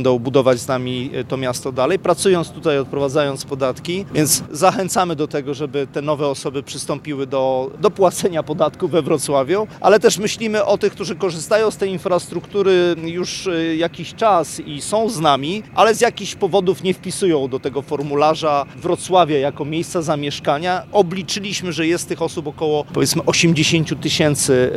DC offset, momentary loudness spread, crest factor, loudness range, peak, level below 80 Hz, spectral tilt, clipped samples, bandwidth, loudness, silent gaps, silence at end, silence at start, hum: under 0.1%; 8 LU; 18 dB; 3 LU; 0 dBFS; -52 dBFS; -4.5 dB/octave; under 0.1%; 15 kHz; -18 LUFS; none; 0 s; 0 s; none